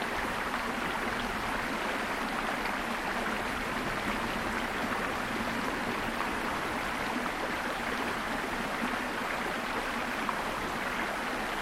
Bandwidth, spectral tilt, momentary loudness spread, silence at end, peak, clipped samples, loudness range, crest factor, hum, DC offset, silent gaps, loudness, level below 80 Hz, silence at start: 16 kHz; -3.5 dB/octave; 1 LU; 0 s; -16 dBFS; under 0.1%; 0 LU; 16 dB; none; under 0.1%; none; -32 LUFS; -50 dBFS; 0 s